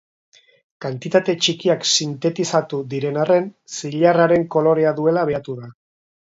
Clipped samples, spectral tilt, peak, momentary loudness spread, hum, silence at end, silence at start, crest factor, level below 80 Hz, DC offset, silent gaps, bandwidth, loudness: under 0.1%; -4.5 dB/octave; -2 dBFS; 13 LU; none; 0.5 s; 0.8 s; 18 dB; -62 dBFS; under 0.1%; none; 7.8 kHz; -19 LUFS